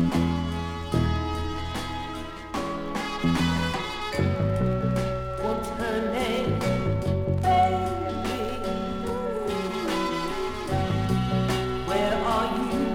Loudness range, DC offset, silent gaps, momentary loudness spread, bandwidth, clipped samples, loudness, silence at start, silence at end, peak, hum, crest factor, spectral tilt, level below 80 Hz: 3 LU; under 0.1%; none; 7 LU; 17 kHz; under 0.1%; -27 LUFS; 0 s; 0 s; -10 dBFS; none; 16 dB; -6.5 dB/octave; -40 dBFS